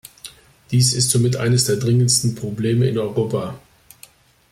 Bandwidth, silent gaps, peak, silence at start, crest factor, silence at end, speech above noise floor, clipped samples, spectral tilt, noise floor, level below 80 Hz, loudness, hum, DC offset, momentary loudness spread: 15.5 kHz; none; -2 dBFS; 0.25 s; 18 dB; 0.95 s; 31 dB; under 0.1%; -4.5 dB/octave; -49 dBFS; -52 dBFS; -18 LUFS; none; under 0.1%; 15 LU